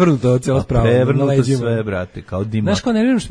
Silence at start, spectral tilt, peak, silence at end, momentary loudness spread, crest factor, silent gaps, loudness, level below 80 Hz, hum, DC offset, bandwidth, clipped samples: 0 s; -7 dB/octave; 0 dBFS; 0 s; 10 LU; 16 dB; none; -17 LUFS; -34 dBFS; none; under 0.1%; 10.5 kHz; under 0.1%